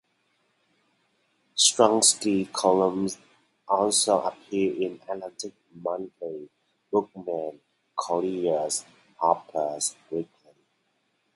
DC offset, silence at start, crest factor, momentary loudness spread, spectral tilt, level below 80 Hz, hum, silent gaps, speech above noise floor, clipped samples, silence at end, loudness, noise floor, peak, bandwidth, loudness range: under 0.1%; 1.55 s; 24 dB; 17 LU; -2.5 dB/octave; -72 dBFS; none; none; 47 dB; under 0.1%; 1.1 s; -25 LUFS; -73 dBFS; -2 dBFS; 12 kHz; 9 LU